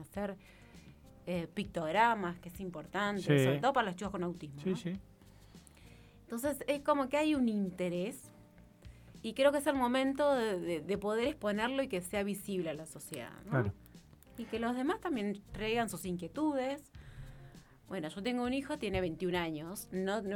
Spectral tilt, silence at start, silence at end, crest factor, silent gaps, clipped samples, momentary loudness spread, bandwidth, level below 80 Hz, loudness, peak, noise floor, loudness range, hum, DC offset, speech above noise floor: -5.5 dB/octave; 0 s; 0 s; 22 dB; none; under 0.1%; 15 LU; 19 kHz; -60 dBFS; -35 LUFS; -14 dBFS; -59 dBFS; 5 LU; none; under 0.1%; 25 dB